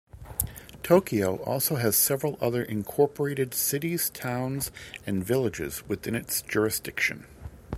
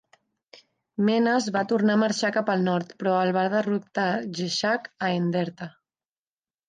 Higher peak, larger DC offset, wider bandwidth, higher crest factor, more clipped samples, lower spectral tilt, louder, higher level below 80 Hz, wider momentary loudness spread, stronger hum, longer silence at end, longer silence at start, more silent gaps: first, -4 dBFS vs -10 dBFS; neither; first, 16 kHz vs 9.4 kHz; first, 24 dB vs 16 dB; neither; second, -4 dB/octave vs -5.5 dB/octave; about the same, -27 LUFS vs -25 LUFS; first, -52 dBFS vs -74 dBFS; first, 12 LU vs 7 LU; neither; second, 0 s vs 1 s; second, 0.15 s vs 1 s; neither